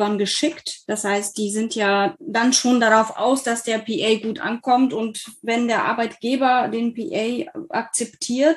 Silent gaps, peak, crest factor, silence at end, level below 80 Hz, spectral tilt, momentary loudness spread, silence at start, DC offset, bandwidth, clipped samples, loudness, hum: none; -2 dBFS; 20 dB; 0 s; -68 dBFS; -3 dB/octave; 9 LU; 0 s; under 0.1%; 12.5 kHz; under 0.1%; -21 LUFS; none